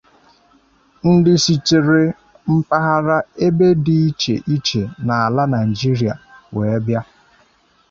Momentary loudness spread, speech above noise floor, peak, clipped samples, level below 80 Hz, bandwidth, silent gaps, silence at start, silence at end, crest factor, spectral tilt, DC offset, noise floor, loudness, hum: 9 LU; 40 dB; -2 dBFS; under 0.1%; -50 dBFS; 7.6 kHz; none; 1.05 s; 0.85 s; 14 dB; -6 dB/octave; under 0.1%; -56 dBFS; -16 LUFS; none